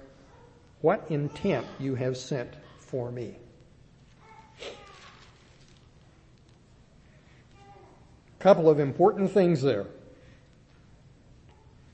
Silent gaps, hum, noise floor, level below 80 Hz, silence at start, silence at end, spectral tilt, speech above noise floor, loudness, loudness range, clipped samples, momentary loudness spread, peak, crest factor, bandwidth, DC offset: none; none; -57 dBFS; -60 dBFS; 0.85 s; 1.95 s; -7.5 dB/octave; 32 dB; -26 LUFS; 24 LU; under 0.1%; 22 LU; -6 dBFS; 24 dB; 8.6 kHz; under 0.1%